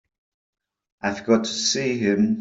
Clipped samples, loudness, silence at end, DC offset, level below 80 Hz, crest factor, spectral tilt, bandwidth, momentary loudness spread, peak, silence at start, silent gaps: under 0.1%; -22 LUFS; 0 s; under 0.1%; -64 dBFS; 18 dB; -4 dB/octave; 8 kHz; 8 LU; -6 dBFS; 1.05 s; none